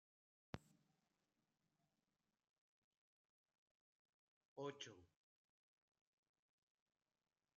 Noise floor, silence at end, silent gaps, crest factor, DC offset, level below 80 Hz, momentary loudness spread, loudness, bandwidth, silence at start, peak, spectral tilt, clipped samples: under -90 dBFS; 2.5 s; 2.49-2.91 s, 2.97-3.46 s, 3.58-4.56 s; 32 dB; under 0.1%; -86 dBFS; 7 LU; -56 LUFS; 7 kHz; 0.55 s; -32 dBFS; -4 dB/octave; under 0.1%